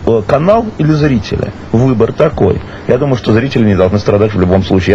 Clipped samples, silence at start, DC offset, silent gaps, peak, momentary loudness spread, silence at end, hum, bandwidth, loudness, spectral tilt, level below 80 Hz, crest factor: 0.7%; 0 s; 1%; none; 0 dBFS; 5 LU; 0 s; none; 8 kHz; -11 LUFS; -8 dB/octave; -32 dBFS; 10 dB